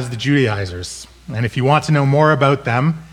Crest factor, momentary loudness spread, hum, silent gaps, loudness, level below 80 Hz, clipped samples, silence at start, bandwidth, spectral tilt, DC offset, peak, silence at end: 16 dB; 15 LU; none; none; -16 LUFS; -46 dBFS; under 0.1%; 0 s; 12 kHz; -6.5 dB/octave; under 0.1%; 0 dBFS; 0.05 s